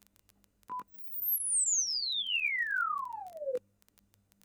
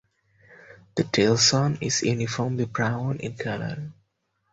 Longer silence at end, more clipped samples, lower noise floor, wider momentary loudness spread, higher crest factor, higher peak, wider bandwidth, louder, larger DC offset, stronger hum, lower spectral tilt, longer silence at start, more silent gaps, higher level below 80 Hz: first, 0.85 s vs 0.6 s; neither; second, -69 dBFS vs -73 dBFS; about the same, 15 LU vs 14 LU; second, 14 dB vs 20 dB; second, -22 dBFS vs -6 dBFS; first, over 20 kHz vs 8 kHz; second, -31 LUFS vs -24 LUFS; neither; neither; second, 3 dB/octave vs -4 dB/octave; first, 0.7 s vs 0.5 s; neither; second, -80 dBFS vs -58 dBFS